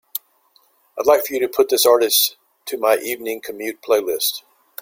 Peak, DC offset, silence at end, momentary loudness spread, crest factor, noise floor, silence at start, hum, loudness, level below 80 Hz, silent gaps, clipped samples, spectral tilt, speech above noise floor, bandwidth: -2 dBFS; under 0.1%; 0.45 s; 16 LU; 18 dB; -59 dBFS; 0.15 s; none; -18 LUFS; -66 dBFS; none; under 0.1%; -0.5 dB/octave; 41 dB; 16.5 kHz